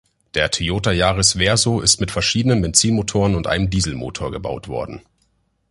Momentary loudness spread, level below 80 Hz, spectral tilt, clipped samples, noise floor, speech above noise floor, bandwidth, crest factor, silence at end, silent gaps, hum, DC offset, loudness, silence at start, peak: 12 LU; -34 dBFS; -3.5 dB/octave; under 0.1%; -65 dBFS; 46 dB; 11.5 kHz; 20 dB; 0.7 s; none; none; under 0.1%; -18 LUFS; 0.35 s; 0 dBFS